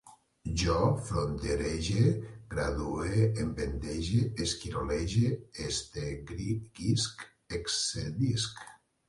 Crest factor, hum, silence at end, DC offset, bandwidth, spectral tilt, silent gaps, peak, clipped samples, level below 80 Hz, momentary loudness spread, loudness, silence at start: 18 dB; none; 0.35 s; under 0.1%; 11.5 kHz; -5 dB/octave; none; -14 dBFS; under 0.1%; -44 dBFS; 10 LU; -32 LUFS; 0.05 s